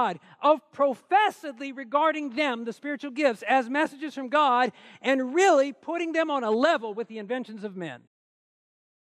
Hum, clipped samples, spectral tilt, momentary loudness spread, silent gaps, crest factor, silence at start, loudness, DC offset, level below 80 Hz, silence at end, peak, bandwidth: none; under 0.1%; -4 dB/octave; 14 LU; none; 16 dB; 0 s; -25 LUFS; under 0.1%; -88 dBFS; 1.2 s; -10 dBFS; 13.5 kHz